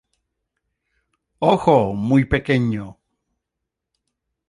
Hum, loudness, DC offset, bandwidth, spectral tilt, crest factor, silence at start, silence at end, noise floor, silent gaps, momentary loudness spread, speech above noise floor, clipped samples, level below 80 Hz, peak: none; -18 LUFS; under 0.1%; 11 kHz; -8 dB/octave; 20 dB; 1.4 s; 1.6 s; -82 dBFS; none; 10 LU; 64 dB; under 0.1%; -42 dBFS; -2 dBFS